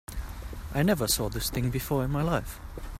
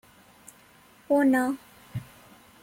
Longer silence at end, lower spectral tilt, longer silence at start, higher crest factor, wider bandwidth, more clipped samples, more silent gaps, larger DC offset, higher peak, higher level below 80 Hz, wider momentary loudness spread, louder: second, 0 s vs 0.6 s; second, -4.5 dB/octave vs -6.5 dB/octave; second, 0.1 s vs 1.1 s; about the same, 18 dB vs 16 dB; about the same, 16 kHz vs 16.5 kHz; neither; neither; neither; about the same, -12 dBFS vs -14 dBFS; first, -40 dBFS vs -64 dBFS; second, 15 LU vs 18 LU; second, -28 LUFS vs -25 LUFS